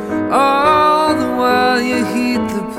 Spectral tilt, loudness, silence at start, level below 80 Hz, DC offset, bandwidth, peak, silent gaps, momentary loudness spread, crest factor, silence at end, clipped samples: -4.5 dB/octave; -14 LUFS; 0 s; -46 dBFS; under 0.1%; 16.5 kHz; -2 dBFS; none; 6 LU; 14 dB; 0 s; under 0.1%